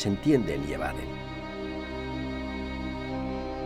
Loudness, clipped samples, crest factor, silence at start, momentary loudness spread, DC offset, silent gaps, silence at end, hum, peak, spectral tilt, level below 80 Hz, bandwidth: -31 LUFS; under 0.1%; 18 dB; 0 s; 11 LU; under 0.1%; none; 0 s; none; -12 dBFS; -6.5 dB/octave; -42 dBFS; 14 kHz